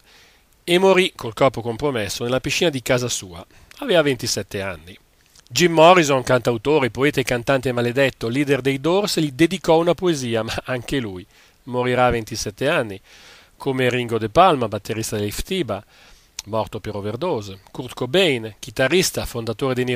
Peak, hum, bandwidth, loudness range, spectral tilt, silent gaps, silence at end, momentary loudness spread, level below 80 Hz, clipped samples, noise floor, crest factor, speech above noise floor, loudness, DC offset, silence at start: 0 dBFS; none; 16 kHz; 6 LU; -4.5 dB/octave; none; 0 s; 13 LU; -46 dBFS; under 0.1%; -53 dBFS; 20 dB; 33 dB; -20 LUFS; under 0.1%; 0.65 s